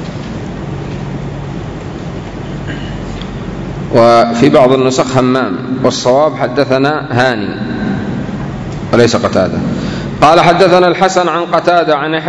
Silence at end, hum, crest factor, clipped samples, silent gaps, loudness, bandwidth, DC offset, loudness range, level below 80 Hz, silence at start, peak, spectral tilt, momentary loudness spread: 0 s; none; 12 dB; 1%; none; -12 LUFS; 11 kHz; under 0.1%; 12 LU; -34 dBFS; 0 s; 0 dBFS; -5.5 dB/octave; 15 LU